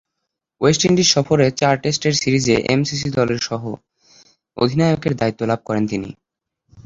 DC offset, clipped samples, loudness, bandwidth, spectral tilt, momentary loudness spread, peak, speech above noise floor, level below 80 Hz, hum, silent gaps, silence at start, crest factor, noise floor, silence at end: under 0.1%; under 0.1%; -18 LUFS; 8 kHz; -4.5 dB/octave; 12 LU; -2 dBFS; 61 dB; -50 dBFS; none; none; 0.6 s; 18 dB; -79 dBFS; 0.05 s